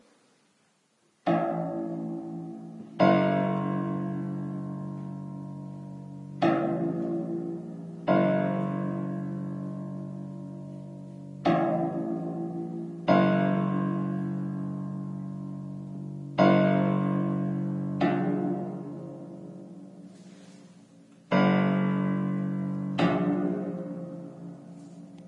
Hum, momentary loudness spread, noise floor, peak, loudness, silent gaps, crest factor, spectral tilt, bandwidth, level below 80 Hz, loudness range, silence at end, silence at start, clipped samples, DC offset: none; 19 LU; -69 dBFS; -8 dBFS; -29 LUFS; none; 22 dB; -9 dB/octave; 6.6 kHz; -70 dBFS; 5 LU; 0 s; 1.25 s; under 0.1%; under 0.1%